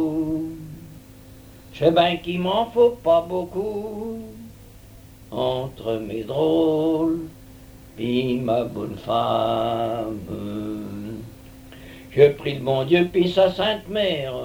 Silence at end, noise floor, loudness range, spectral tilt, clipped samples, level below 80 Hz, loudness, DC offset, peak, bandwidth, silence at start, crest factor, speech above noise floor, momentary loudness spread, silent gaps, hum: 0 s; -45 dBFS; 5 LU; -7 dB/octave; under 0.1%; -50 dBFS; -22 LUFS; under 0.1%; -2 dBFS; over 20 kHz; 0 s; 20 dB; 24 dB; 20 LU; none; none